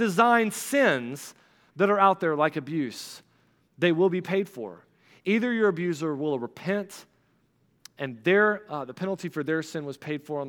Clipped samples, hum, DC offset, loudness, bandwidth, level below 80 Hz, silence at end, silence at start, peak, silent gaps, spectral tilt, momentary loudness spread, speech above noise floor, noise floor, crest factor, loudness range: under 0.1%; none; under 0.1%; -26 LUFS; 18 kHz; -80 dBFS; 0 s; 0 s; -6 dBFS; none; -5.5 dB/octave; 17 LU; 42 dB; -67 dBFS; 20 dB; 4 LU